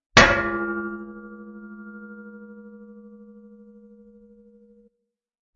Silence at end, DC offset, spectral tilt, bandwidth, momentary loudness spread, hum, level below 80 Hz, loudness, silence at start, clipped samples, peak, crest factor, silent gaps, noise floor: 2.55 s; under 0.1%; -2 dB/octave; 7.4 kHz; 29 LU; none; -44 dBFS; -20 LUFS; 0.15 s; under 0.1%; 0 dBFS; 26 dB; none; -80 dBFS